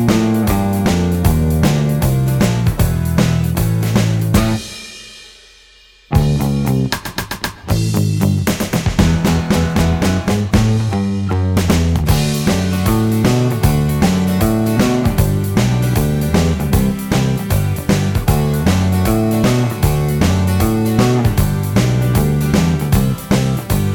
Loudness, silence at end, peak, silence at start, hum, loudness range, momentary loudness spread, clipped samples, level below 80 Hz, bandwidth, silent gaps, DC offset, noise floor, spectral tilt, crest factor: -15 LUFS; 0 s; 0 dBFS; 0 s; none; 3 LU; 3 LU; under 0.1%; -26 dBFS; over 20 kHz; none; under 0.1%; -46 dBFS; -6 dB/octave; 14 dB